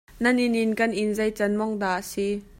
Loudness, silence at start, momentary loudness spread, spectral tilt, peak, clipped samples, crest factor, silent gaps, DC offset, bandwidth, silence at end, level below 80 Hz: -24 LUFS; 0.15 s; 5 LU; -5 dB/octave; -8 dBFS; under 0.1%; 16 dB; none; under 0.1%; 16.5 kHz; 0.15 s; -54 dBFS